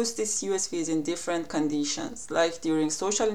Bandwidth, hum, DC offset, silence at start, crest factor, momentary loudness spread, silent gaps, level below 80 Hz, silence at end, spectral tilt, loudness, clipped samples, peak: 15 kHz; none; 0.6%; 0 s; 16 dB; 4 LU; none; -62 dBFS; 0 s; -3 dB/octave; -28 LUFS; under 0.1%; -10 dBFS